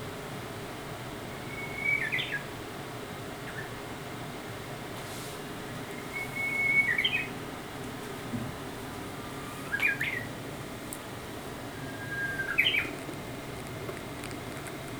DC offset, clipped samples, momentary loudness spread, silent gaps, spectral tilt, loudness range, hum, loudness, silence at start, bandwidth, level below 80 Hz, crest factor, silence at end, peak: under 0.1%; under 0.1%; 13 LU; none; -3.5 dB/octave; 8 LU; none; -33 LUFS; 0 s; over 20 kHz; -56 dBFS; 24 dB; 0 s; -12 dBFS